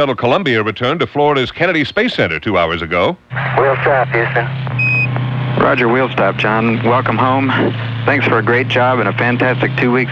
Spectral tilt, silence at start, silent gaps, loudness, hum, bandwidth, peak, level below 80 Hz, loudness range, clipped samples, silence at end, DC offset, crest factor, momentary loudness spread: -7.5 dB/octave; 0 s; none; -14 LUFS; none; 7.4 kHz; 0 dBFS; -44 dBFS; 1 LU; under 0.1%; 0 s; under 0.1%; 14 dB; 4 LU